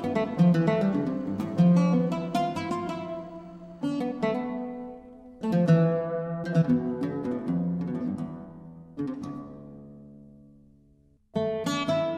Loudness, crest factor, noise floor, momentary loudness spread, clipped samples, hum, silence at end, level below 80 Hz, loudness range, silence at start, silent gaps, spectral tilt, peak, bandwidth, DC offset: -27 LUFS; 18 dB; -61 dBFS; 21 LU; under 0.1%; none; 0 s; -62 dBFS; 11 LU; 0 s; none; -8 dB/octave; -10 dBFS; 9 kHz; under 0.1%